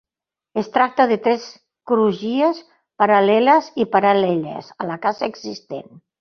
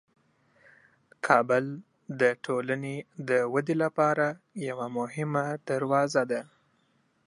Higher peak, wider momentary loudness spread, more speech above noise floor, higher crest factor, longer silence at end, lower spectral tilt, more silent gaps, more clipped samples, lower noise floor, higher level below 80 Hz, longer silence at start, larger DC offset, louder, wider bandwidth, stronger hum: about the same, -2 dBFS vs -4 dBFS; first, 17 LU vs 12 LU; first, 70 dB vs 42 dB; second, 18 dB vs 24 dB; second, 0.4 s vs 0.8 s; about the same, -6 dB/octave vs -6 dB/octave; neither; neither; first, -88 dBFS vs -70 dBFS; first, -66 dBFS vs -80 dBFS; second, 0.55 s vs 1.25 s; neither; first, -18 LUFS vs -28 LUFS; second, 6.8 kHz vs 11.5 kHz; neither